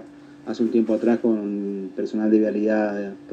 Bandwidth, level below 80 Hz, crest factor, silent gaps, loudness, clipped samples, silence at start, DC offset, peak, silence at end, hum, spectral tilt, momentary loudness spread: 7.6 kHz; -70 dBFS; 16 dB; none; -22 LUFS; under 0.1%; 0 s; under 0.1%; -6 dBFS; 0 s; none; -8 dB/octave; 10 LU